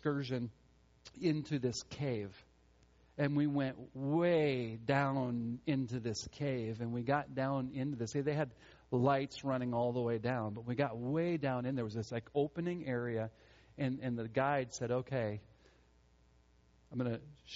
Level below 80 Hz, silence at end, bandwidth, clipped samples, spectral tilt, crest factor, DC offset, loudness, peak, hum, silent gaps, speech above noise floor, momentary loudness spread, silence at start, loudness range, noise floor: -68 dBFS; 0 s; 7.6 kHz; under 0.1%; -6.5 dB/octave; 20 dB; under 0.1%; -37 LUFS; -18 dBFS; none; none; 31 dB; 8 LU; 0.05 s; 4 LU; -68 dBFS